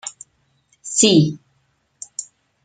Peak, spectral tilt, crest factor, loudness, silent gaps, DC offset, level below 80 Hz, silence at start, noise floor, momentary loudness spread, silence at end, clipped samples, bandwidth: -2 dBFS; -4 dB/octave; 20 dB; -15 LUFS; none; under 0.1%; -62 dBFS; 0.05 s; -65 dBFS; 25 LU; 0.4 s; under 0.1%; 9.6 kHz